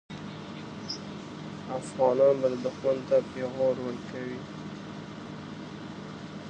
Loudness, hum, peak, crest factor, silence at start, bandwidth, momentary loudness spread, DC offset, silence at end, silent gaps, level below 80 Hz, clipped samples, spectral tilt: -31 LUFS; none; -10 dBFS; 20 dB; 0.1 s; 9.2 kHz; 17 LU; under 0.1%; 0 s; none; -64 dBFS; under 0.1%; -6 dB/octave